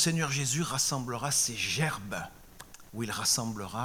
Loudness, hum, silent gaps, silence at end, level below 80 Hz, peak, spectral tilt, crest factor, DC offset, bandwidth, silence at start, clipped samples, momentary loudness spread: -29 LUFS; none; none; 0 s; -58 dBFS; -12 dBFS; -2.5 dB/octave; 20 dB; under 0.1%; 18 kHz; 0 s; under 0.1%; 16 LU